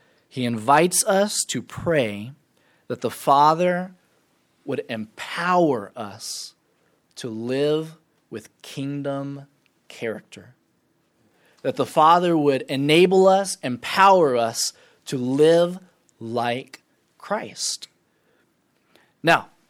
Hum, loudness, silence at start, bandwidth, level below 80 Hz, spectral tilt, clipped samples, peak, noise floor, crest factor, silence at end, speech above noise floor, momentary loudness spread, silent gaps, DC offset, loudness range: none; -21 LUFS; 0.35 s; 18 kHz; -66 dBFS; -4 dB/octave; under 0.1%; -2 dBFS; -67 dBFS; 20 dB; 0.25 s; 46 dB; 21 LU; none; under 0.1%; 12 LU